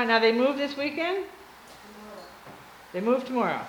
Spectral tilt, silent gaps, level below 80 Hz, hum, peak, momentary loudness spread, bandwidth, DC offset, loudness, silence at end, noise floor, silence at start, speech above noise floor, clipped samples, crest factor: -5 dB/octave; none; -68 dBFS; none; -8 dBFS; 25 LU; over 20 kHz; under 0.1%; -26 LUFS; 0 s; -48 dBFS; 0 s; 23 dB; under 0.1%; 20 dB